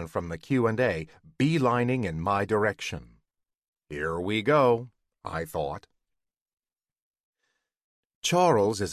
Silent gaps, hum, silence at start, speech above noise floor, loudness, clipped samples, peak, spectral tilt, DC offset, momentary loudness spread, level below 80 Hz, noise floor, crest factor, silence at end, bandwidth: 3.68-3.73 s, 6.41-6.46 s, 6.53-6.57 s, 7.02-7.11 s, 7.20-7.33 s, 7.84-8.22 s; none; 0 s; 59 dB; -27 LUFS; under 0.1%; -10 dBFS; -5.5 dB/octave; under 0.1%; 15 LU; -52 dBFS; -85 dBFS; 18 dB; 0 s; 14 kHz